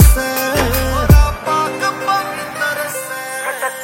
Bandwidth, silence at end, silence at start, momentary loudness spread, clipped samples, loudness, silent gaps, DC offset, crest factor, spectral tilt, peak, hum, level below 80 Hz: 16.5 kHz; 0 s; 0 s; 10 LU; 0.3%; -16 LUFS; none; under 0.1%; 14 dB; -4.5 dB/octave; 0 dBFS; none; -18 dBFS